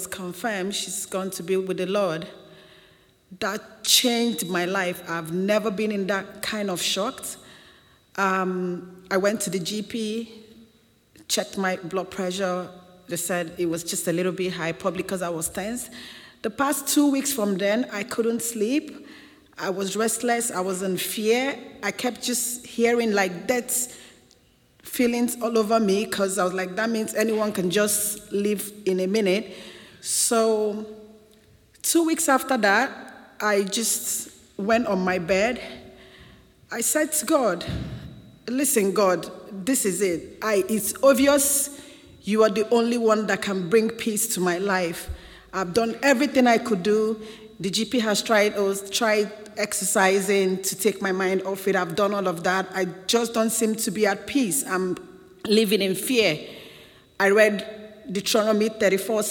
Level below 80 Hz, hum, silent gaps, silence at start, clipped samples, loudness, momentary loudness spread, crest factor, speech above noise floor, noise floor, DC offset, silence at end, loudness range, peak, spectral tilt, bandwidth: -56 dBFS; none; none; 0 s; under 0.1%; -23 LUFS; 12 LU; 22 dB; 36 dB; -59 dBFS; under 0.1%; 0 s; 5 LU; -2 dBFS; -3.5 dB/octave; 18 kHz